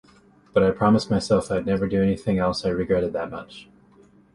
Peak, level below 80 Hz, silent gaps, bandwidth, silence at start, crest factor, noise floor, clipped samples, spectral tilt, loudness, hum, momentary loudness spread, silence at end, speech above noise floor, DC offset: -6 dBFS; -46 dBFS; none; 11.5 kHz; 0.55 s; 18 dB; -54 dBFS; under 0.1%; -7 dB/octave; -23 LUFS; none; 10 LU; 0.7 s; 32 dB; under 0.1%